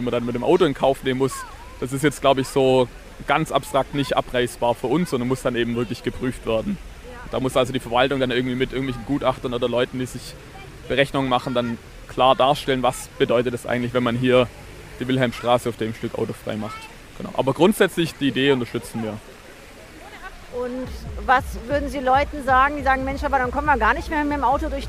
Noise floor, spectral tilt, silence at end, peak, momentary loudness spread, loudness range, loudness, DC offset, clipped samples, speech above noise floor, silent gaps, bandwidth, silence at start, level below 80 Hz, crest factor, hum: -42 dBFS; -5.5 dB/octave; 0 s; -2 dBFS; 16 LU; 4 LU; -22 LUFS; under 0.1%; under 0.1%; 21 dB; none; 16 kHz; 0 s; -38 dBFS; 20 dB; none